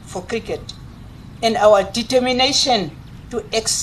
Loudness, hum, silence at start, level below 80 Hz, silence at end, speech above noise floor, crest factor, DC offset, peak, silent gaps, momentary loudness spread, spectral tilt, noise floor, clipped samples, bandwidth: -17 LUFS; none; 0 s; -42 dBFS; 0 s; 20 dB; 18 dB; under 0.1%; -2 dBFS; none; 16 LU; -2.5 dB/octave; -37 dBFS; under 0.1%; 13 kHz